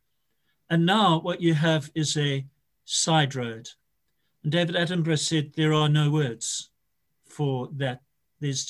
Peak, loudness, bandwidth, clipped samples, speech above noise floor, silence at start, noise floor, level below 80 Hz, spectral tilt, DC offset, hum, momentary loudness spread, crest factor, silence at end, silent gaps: -8 dBFS; -25 LUFS; 12 kHz; under 0.1%; 54 dB; 0.7 s; -78 dBFS; -66 dBFS; -4.5 dB/octave; under 0.1%; none; 12 LU; 18 dB; 0 s; none